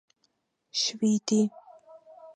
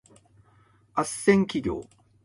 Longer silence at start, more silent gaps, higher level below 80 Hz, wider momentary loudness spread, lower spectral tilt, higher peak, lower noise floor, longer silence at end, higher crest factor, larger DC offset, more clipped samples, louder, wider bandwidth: second, 0.75 s vs 0.95 s; neither; second, -80 dBFS vs -54 dBFS; second, 6 LU vs 11 LU; second, -4 dB/octave vs -5.5 dB/octave; second, -14 dBFS vs -6 dBFS; first, -74 dBFS vs -60 dBFS; second, 0.05 s vs 0.4 s; second, 16 dB vs 22 dB; neither; neither; about the same, -27 LUFS vs -26 LUFS; second, 9.6 kHz vs 11.5 kHz